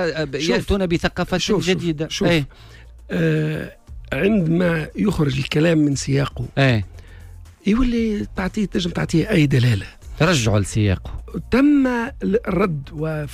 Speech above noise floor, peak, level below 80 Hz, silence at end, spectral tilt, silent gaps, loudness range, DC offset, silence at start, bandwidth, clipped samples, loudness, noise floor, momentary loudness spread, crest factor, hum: 21 dB; -6 dBFS; -36 dBFS; 0 s; -6 dB/octave; none; 3 LU; under 0.1%; 0 s; 15.5 kHz; under 0.1%; -20 LUFS; -40 dBFS; 9 LU; 14 dB; none